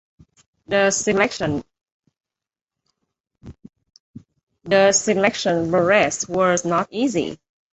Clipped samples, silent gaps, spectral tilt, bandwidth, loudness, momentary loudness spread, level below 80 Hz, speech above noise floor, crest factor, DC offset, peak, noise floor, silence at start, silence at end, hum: under 0.1%; 1.92-2.00 s, 2.61-2.65 s, 3.20-3.24 s, 4.00-4.14 s, 4.43-4.47 s; -3.5 dB/octave; 8.4 kHz; -19 LUFS; 9 LU; -56 dBFS; 70 dB; 18 dB; under 0.1%; -4 dBFS; -89 dBFS; 0.7 s; 0.4 s; none